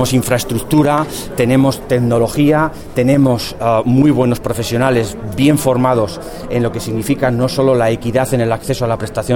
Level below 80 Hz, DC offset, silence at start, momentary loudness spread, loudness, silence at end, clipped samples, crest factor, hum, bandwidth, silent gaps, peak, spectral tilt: -36 dBFS; under 0.1%; 0 s; 6 LU; -14 LUFS; 0 s; under 0.1%; 14 dB; none; 18 kHz; none; 0 dBFS; -6 dB/octave